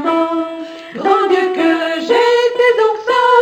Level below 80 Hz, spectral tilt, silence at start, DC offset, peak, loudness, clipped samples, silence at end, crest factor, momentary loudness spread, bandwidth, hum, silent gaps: -64 dBFS; -3.5 dB/octave; 0 s; under 0.1%; 0 dBFS; -14 LUFS; under 0.1%; 0 s; 14 dB; 9 LU; 15 kHz; none; none